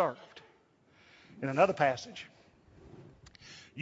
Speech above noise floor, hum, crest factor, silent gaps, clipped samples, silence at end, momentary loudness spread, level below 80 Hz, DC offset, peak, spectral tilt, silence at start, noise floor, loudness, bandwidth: 35 dB; none; 24 dB; none; under 0.1%; 0 s; 28 LU; -70 dBFS; under 0.1%; -10 dBFS; -4 dB/octave; 0 s; -66 dBFS; -30 LUFS; 7.6 kHz